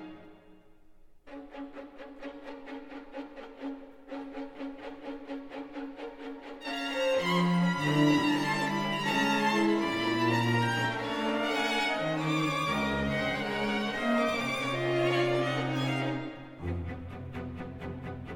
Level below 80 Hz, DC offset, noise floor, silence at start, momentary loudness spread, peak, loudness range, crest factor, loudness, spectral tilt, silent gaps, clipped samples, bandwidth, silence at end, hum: -56 dBFS; under 0.1%; -55 dBFS; 0 s; 17 LU; -14 dBFS; 16 LU; 18 dB; -29 LUFS; -5.5 dB/octave; none; under 0.1%; 18 kHz; 0 s; none